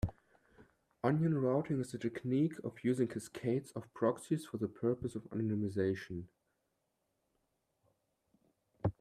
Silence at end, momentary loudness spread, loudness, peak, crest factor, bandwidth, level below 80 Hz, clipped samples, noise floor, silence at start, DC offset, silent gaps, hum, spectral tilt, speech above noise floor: 0.1 s; 8 LU; -37 LUFS; -18 dBFS; 18 dB; 14 kHz; -62 dBFS; under 0.1%; -83 dBFS; 0.05 s; under 0.1%; none; none; -8 dB/octave; 47 dB